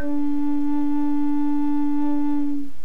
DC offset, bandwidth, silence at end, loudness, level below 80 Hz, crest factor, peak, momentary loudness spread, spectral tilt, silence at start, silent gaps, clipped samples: 10%; 4 kHz; 0.1 s; -24 LUFS; -50 dBFS; 8 dB; -12 dBFS; 2 LU; -8 dB/octave; 0 s; none; under 0.1%